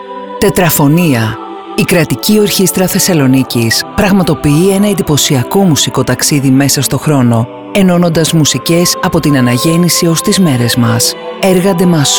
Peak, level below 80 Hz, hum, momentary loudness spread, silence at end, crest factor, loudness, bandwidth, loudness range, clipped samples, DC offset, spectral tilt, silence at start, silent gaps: 0 dBFS; -38 dBFS; none; 3 LU; 0 s; 10 dB; -9 LUFS; over 20 kHz; 1 LU; under 0.1%; under 0.1%; -4.5 dB/octave; 0 s; none